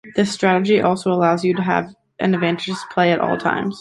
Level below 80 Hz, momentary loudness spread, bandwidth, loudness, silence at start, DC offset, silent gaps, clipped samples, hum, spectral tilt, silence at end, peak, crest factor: -58 dBFS; 7 LU; 11.5 kHz; -18 LUFS; 0.05 s; under 0.1%; none; under 0.1%; none; -6 dB/octave; 0 s; -2 dBFS; 16 dB